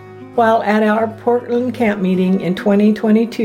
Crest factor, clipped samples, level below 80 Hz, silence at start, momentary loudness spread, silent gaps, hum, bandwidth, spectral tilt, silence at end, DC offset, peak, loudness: 12 dB; under 0.1%; -58 dBFS; 0 s; 4 LU; none; none; 12 kHz; -8 dB/octave; 0 s; under 0.1%; -2 dBFS; -15 LUFS